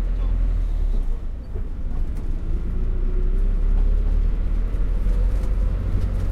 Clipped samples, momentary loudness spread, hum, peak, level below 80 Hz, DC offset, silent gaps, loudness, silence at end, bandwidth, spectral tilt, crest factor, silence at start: under 0.1%; 7 LU; none; -10 dBFS; -20 dBFS; under 0.1%; none; -26 LUFS; 0 s; 3.2 kHz; -8.5 dB/octave; 10 dB; 0 s